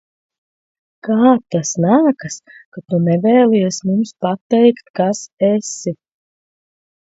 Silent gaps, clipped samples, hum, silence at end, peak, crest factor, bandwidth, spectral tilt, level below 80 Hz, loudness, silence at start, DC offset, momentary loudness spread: 2.65-2.72 s, 4.41-4.50 s, 4.90-4.94 s, 5.33-5.37 s; under 0.1%; none; 1.2 s; 0 dBFS; 16 dB; 8 kHz; -6 dB/octave; -64 dBFS; -15 LUFS; 1.05 s; under 0.1%; 13 LU